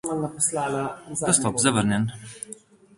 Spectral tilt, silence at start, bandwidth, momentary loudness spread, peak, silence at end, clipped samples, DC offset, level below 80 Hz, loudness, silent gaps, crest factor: -4 dB/octave; 0.05 s; 11.5 kHz; 17 LU; -4 dBFS; 0.45 s; under 0.1%; under 0.1%; -56 dBFS; -23 LUFS; none; 22 dB